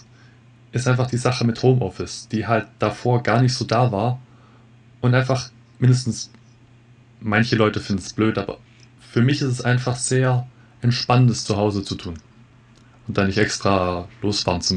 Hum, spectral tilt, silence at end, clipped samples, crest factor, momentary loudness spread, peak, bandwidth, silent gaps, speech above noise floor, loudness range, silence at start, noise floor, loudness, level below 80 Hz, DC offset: none; -5.5 dB/octave; 0 s; under 0.1%; 18 dB; 12 LU; -2 dBFS; 10 kHz; none; 30 dB; 3 LU; 0.75 s; -50 dBFS; -21 LUFS; -50 dBFS; under 0.1%